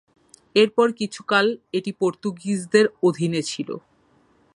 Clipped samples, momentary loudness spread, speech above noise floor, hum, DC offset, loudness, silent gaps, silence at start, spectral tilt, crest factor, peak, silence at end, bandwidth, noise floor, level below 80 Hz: under 0.1%; 11 LU; 39 dB; none; under 0.1%; -22 LUFS; none; 0.55 s; -5 dB/octave; 20 dB; -4 dBFS; 0.75 s; 11.5 kHz; -60 dBFS; -68 dBFS